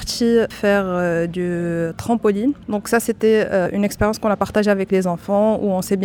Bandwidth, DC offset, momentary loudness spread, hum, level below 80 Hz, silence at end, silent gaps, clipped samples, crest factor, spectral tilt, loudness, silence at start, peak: 19 kHz; under 0.1%; 5 LU; none; -44 dBFS; 0 s; none; under 0.1%; 16 dB; -5.5 dB/octave; -19 LUFS; 0 s; -4 dBFS